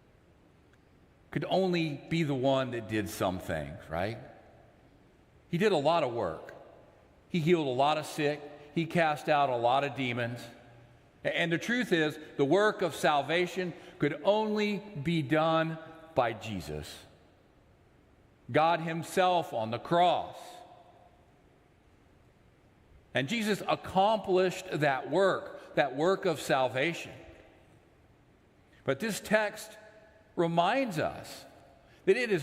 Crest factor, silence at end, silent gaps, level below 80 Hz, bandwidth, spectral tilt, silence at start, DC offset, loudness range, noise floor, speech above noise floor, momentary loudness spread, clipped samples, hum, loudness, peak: 20 dB; 0 s; none; -64 dBFS; 16 kHz; -5.5 dB/octave; 1.3 s; under 0.1%; 6 LU; -62 dBFS; 33 dB; 13 LU; under 0.1%; none; -30 LUFS; -12 dBFS